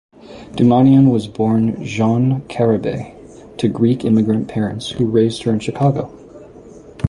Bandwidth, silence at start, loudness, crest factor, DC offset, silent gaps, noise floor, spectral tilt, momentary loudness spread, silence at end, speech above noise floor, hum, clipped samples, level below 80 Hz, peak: 11 kHz; 0.25 s; -16 LUFS; 14 dB; under 0.1%; none; -39 dBFS; -8 dB/octave; 12 LU; 0 s; 24 dB; none; under 0.1%; -44 dBFS; -2 dBFS